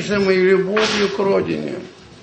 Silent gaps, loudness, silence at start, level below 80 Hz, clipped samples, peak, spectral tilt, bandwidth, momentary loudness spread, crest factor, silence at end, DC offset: none; -17 LUFS; 0 s; -52 dBFS; under 0.1%; -4 dBFS; -5 dB/octave; 8.6 kHz; 11 LU; 14 dB; 0.1 s; under 0.1%